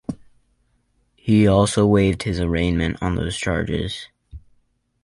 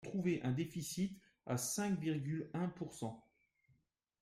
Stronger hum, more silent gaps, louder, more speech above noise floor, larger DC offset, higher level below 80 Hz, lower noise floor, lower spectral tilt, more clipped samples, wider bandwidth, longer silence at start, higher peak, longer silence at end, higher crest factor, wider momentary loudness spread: neither; neither; first, -20 LUFS vs -41 LUFS; first, 46 dB vs 39 dB; neither; first, -36 dBFS vs -72 dBFS; second, -65 dBFS vs -79 dBFS; about the same, -6 dB/octave vs -5.5 dB/octave; neither; second, 11.5 kHz vs 16 kHz; about the same, 0.1 s vs 0 s; first, -4 dBFS vs -26 dBFS; second, 0.65 s vs 1 s; about the same, 18 dB vs 16 dB; first, 17 LU vs 9 LU